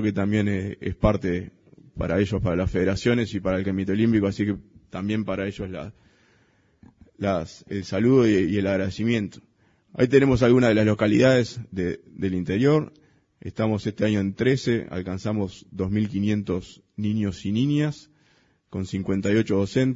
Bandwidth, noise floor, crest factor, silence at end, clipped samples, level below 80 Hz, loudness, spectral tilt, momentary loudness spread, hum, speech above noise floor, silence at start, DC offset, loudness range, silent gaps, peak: 7.8 kHz; -63 dBFS; 20 dB; 0 s; under 0.1%; -46 dBFS; -24 LUFS; -7 dB/octave; 14 LU; none; 40 dB; 0 s; under 0.1%; 6 LU; none; -4 dBFS